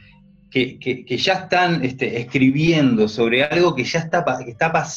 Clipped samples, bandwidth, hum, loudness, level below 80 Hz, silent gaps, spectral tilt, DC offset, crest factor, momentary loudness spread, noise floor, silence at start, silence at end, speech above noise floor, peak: under 0.1%; 7.6 kHz; none; -19 LUFS; -52 dBFS; none; -5.5 dB/octave; under 0.1%; 16 dB; 8 LU; -49 dBFS; 0.5 s; 0 s; 31 dB; -2 dBFS